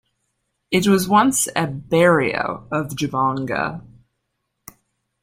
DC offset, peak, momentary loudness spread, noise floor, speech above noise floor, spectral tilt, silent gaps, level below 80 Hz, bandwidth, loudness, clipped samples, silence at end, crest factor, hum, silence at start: under 0.1%; -2 dBFS; 10 LU; -75 dBFS; 56 dB; -4.5 dB/octave; none; -54 dBFS; 16.5 kHz; -19 LUFS; under 0.1%; 1.4 s; 20 dB; none; 0.7 s